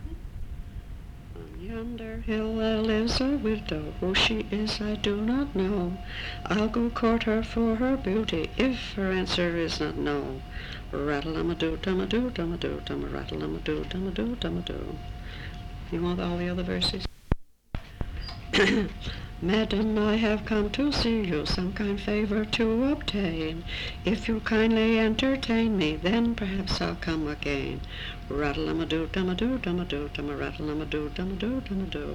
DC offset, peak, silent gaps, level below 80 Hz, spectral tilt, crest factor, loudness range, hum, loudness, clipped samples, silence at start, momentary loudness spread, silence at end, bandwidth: under 0.1%; -6 dBFS; none; -40 dBFS; -6 dB/octave; 22 dB; 6 LU; none; -28 LUFS; under 0.1%; 0 s; 13 LU; 0 s; 12 kHz